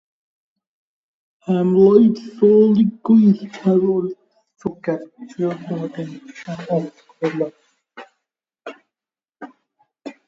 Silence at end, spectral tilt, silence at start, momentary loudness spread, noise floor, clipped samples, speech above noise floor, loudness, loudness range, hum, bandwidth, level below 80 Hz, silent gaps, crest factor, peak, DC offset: 0.15 s; -9 dB/octave; 1.5 s; 24 LU; under -90 dBFS; under 0.1%; over 73 dB; -17 LUFS; 13 LU; none; 7.4 kHz; -64 dBFS; none; 18 dB; 0 dBFS; under 0.1%